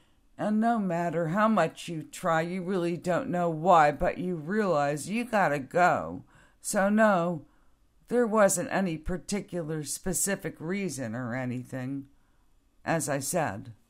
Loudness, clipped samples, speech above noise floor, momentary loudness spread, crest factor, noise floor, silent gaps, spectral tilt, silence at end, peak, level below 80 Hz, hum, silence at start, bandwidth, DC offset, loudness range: -28 LUFS; under 0.1%; 36 dB; 12 LU; 20 dB; -63 dBFS; none; -5 dB/octave; 0.15 s; -8 dBFS; -52 dBFS; none; 0.4 s; 16 kHz; under 0.1%; 6 LU